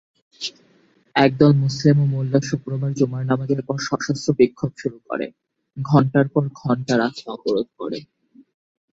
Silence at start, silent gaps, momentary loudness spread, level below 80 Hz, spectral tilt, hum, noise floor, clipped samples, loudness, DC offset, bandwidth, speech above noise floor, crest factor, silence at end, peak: 0.4 s; none; 14 LU; -58 dBFS; -7 dB/octave; none; -58 dBFS; under 0.1%; -21 LUFS; under 0.1%; 7.8 kHz; 38 dB; 20 dB; 0.95 s; -2 dBFS